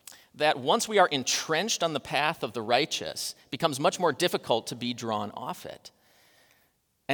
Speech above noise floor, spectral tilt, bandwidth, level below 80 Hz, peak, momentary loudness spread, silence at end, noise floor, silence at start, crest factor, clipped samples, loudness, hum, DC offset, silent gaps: 42 dB; -3 dB/octave; over 20 kHz; -72 dBFS; -8 dBFS; 14 LU; 0 s; -70 dBFS; 0.1 s; 22 dB; under 0.1%; -27 LUFS; none; under 0.1%; none